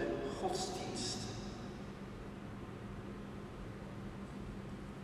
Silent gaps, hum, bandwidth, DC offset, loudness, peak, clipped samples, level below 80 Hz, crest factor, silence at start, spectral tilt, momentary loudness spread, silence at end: none; none; 14 kHz; under 0.1%; -44 LUFS; -24 dBFS; under 0.1%; -56 dBFS; 20 dB; 0 s; -4.5 dB/octave; 9 LU; 0 s